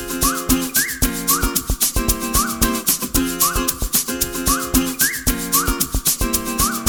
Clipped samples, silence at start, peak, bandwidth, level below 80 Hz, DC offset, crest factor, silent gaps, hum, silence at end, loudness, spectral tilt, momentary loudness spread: under 0.1%; 0 s; 0 dBFS; over 20 kHz; -28 dBFS; under 0.1%; 20 dB; none; none; 0 s; -18 LUFS; -2.5 dB/octave; 3 LU